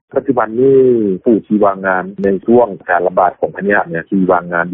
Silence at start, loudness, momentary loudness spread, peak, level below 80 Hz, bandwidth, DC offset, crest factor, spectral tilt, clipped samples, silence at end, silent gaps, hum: 0.15 s; -13 LUFS; 6 LU; -2 dBFS; -50 dBFS; 3.7 kHz; under 0.1%; 12 dB; -7.5 dB/octave; under 0.1%; 0 s; none; none